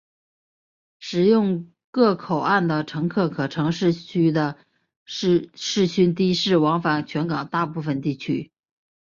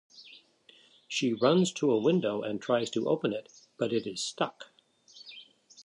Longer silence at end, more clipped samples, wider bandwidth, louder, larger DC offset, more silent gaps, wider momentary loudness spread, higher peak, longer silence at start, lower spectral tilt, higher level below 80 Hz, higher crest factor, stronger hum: first, 0.6 s vs 0.05 s; neither; second, 7.6 kHz vs 11.5 kHz; first, -22 LUFS vs -29 LUFS; neither; first, 1.84-1.93 s, 4.96-5.06 s vs none; second, 9 LU vs 23 LU; first, -6 dBFS vs -12 dBFS; first, 1 s vs 0.15 s; about the same, -6 dB/octave vs -5 dB/octave; first, -62 dBFS vs -76 dBFS; about the same, 16 dB vs 20 dB; neither